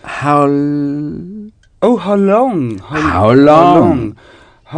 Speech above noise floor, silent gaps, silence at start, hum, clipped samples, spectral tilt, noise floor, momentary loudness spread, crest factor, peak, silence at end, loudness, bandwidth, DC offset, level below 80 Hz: 21 dB; none; 0.05 s; none; 0.5%; -8 dB/octave; -32 dBFS; 17 LU; 12 dB; 0 dBFS; 0 s; -11 LUFS; 10 kHz; under 0.1%; -40 dBFS